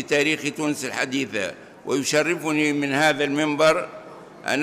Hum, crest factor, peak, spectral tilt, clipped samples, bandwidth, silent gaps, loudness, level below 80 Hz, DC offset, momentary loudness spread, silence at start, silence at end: none; 16 dB; -6 dBFS; -3.5 dB/octave; under 0.1%; 15.5 kHz; none; -22 LUFS; -64 dBFS; under 0.1%; 13 LU; 0 s; 0 s